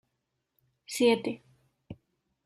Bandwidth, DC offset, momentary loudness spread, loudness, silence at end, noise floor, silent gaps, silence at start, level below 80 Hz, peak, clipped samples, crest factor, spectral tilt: 14.5 kHz; under 0.1%; 25 LU; -28 LUFS; 0.5 s; -82 dBFS; none; 0.9 s; -72 dBFS; -12 dBFS; under 0.1%; 22 dB; -4 dB/octave